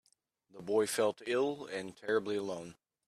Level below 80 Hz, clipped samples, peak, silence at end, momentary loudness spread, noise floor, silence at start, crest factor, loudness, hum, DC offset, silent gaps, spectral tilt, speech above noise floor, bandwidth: -78 dBFS; under 0.1%; -18 dBFS; 0.35 s; 12 LU; -73 dBFS; 0.55 s; 18 dB; -35 LUFS; none; under 0.1%; none; -4 dB/octave; 39 dB; 14.5 kHz